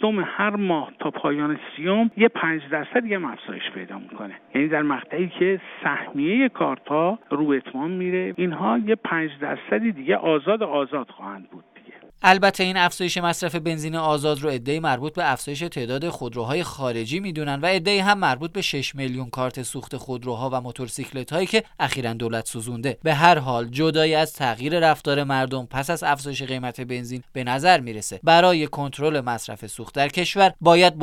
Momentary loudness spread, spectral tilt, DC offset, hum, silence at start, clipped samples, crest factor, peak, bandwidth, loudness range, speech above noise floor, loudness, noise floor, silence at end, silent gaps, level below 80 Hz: 13 LU; -4.5 dB/octave; under 0.1%; none; 0 s; under 0.1%; 22 dB; 0 dBFS; 17 kHz; 5 LU; 25 dB; -22 LUFS; -48 dBFS; 0 s; none; -56 dBFS